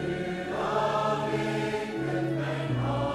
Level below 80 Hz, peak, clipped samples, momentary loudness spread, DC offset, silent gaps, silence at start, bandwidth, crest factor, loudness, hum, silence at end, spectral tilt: -52 dBFS; -16 dBFS; under 0.1%; 4 LU; under 0.1%; none; 0 s; 13 kHz; 14 dB; -29 LUFS; none; 0 s; -6.5 dB/octave